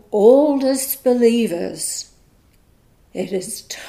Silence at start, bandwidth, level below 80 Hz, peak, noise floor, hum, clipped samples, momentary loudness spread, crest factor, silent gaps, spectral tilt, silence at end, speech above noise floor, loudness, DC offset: 0.1 s; 15.5 kHz; -58 dBFS; 0 dBFS; -54 dBFS; none; under 0.1%; 16 LU; 18 dB; none; -4 dB/octave; 0 s; 37 dB; -18 LUFS; under 0.1%